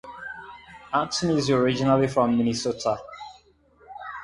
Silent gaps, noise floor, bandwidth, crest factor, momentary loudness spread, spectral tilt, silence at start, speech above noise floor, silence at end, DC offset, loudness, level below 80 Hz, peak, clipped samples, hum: none; -57 dBFS; 11.5 kHz; 18 dB; 21 LU; -5.5 dB/octave; 0.05 s; 35 dB; 0 s; under 0.1%; -23 LUFS; -56 dBFS; -6 dBFS; under 0.1%; none